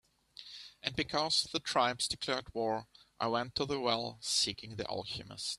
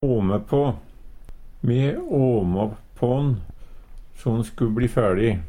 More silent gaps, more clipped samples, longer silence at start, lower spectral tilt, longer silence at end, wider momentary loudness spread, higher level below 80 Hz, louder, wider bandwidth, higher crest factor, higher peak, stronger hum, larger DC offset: neither; neither; first, 0.4 s vs 0 s; second, -2.5 dB/octave vs -9 dB/octave; about the same, 0 s vs 0 s; first, 11 LU vs 8 LU; second, -64 dBFS vs -38 dBFS; second, -34 LUFS vs -23 LUFS; first, 14.5 kHz vs 11 kHz; first, 22 dB vs 16 dB; second, -14 dBFS vs -6 dBFS; neither; neither